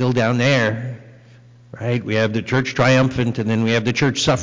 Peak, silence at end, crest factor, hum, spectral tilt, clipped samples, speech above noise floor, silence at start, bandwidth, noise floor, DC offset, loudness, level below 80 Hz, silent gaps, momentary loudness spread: -8 dBFS; 0 s; 10 dB; none; -5.5 dB/octave; under 0.1%; 28 dB; 0 s; 7.6 kHz; -46 dBFS; under 0.1%; -18 LUFS; -48 dBFS; none; 10 LU